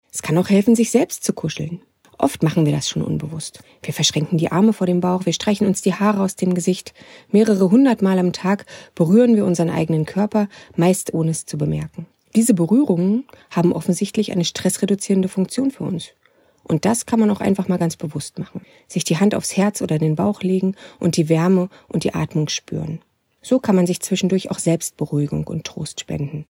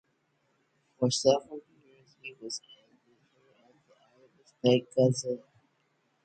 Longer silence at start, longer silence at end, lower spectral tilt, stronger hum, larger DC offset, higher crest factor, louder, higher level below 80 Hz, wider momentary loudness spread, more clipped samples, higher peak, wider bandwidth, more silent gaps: second, 0.15 s vs 1 s; second, 0.1 s vs 0.9 s; about the same, -5.5 dB/octave vs -5 dB/octave; neither; neither; about the same, 18 dB vs 22 dB; first, -19 LUFS vs -29 LUFS; first, -54 dBFS vs -74 dBFS; second, 12 LU vs 21 LU; neither; first, 0 dBFS vs -10 dBFS; first, 16.5 kHz vs 9.2 kHz; neither